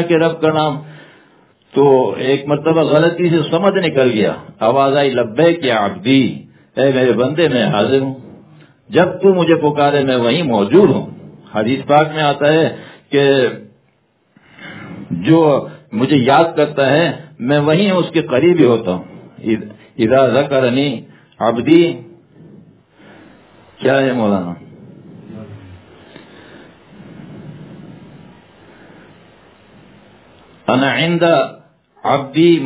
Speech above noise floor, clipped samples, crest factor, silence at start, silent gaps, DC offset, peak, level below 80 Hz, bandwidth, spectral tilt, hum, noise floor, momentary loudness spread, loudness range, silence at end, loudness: 46 dB; under 0.1%; 16 dB; 0 s; none; under 0.1%; 0 dBFS; -54 dBFS; 4 kHz; -10.5 dB/octave; none; -59 dBFS; 17 LU; 7 LU; 0 s; -14 LUFS